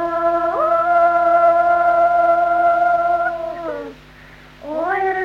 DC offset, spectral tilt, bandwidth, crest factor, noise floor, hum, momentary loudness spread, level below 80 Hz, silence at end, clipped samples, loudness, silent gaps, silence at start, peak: under 0.1%; -6 dB/octave; 6 kHz; 12 dB; -42 dBFS; none; 14 LU; -50 dBFS; 0 s; under 0.1%; -16 LUFS; none; 0 s; -4 dBFS